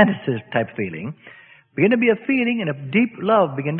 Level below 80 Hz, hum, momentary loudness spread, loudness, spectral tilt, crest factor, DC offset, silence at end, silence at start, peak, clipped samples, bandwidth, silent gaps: -62 dBFS; none; 14 LU; -20 LUFS; -11 dB/octave; 20 dB; under 0.1%; 0 s; 0 s; 0 dBFS; under 0.1%; 4.2 kHz; none